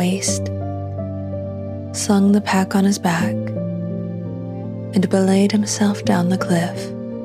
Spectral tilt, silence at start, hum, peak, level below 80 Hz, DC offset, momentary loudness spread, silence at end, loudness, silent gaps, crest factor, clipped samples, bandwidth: -5.5 dB/octave; 0 s; none; -2 dBFS; -56 dBFS; under 0.1%; 12 LU; 0 s; -20 LUFS; none; 16 dB; under 0.1%; 14.5 kHz